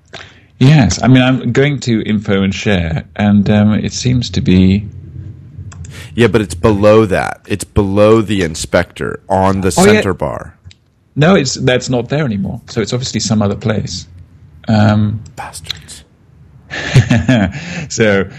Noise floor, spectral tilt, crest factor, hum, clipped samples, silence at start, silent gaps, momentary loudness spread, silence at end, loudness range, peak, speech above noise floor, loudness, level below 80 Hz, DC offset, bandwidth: -44 dBFS; -6 dB/octave; 12 dB; none; 0.1%; 0.15 s; none; 17 LU; 0 s; 4 LU; 0 dBFS; 32 dB; -13 LUFS; -36 dBFS; under 0.1%; 14 kHz